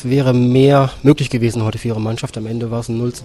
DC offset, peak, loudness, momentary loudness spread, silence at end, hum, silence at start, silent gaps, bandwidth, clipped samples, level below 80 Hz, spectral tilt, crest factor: under 0.1%; 0 dBFS; -16 LUFS; 11 LU; 0 s; none; 0 s; none; 12.5 kHz; under 0.1%; -42 dBFS; -7 dB/octave; 16 dB